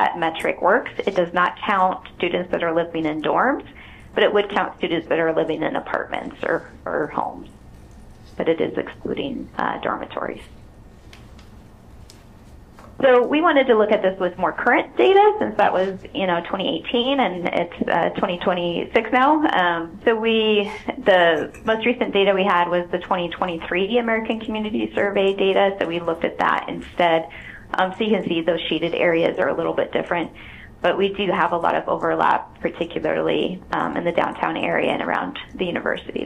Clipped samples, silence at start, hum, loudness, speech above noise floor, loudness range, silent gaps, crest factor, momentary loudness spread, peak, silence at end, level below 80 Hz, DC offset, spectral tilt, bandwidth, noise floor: under 0.1%; 0 s; none; -21 LUFS; 24 dB; 8 LU; none; 18 dB; 9 LU; -4 dBFS; 0 s; -50 dBFS; under 0.1%; -6.5 dB/octave; 10 kHz; -44 dBFS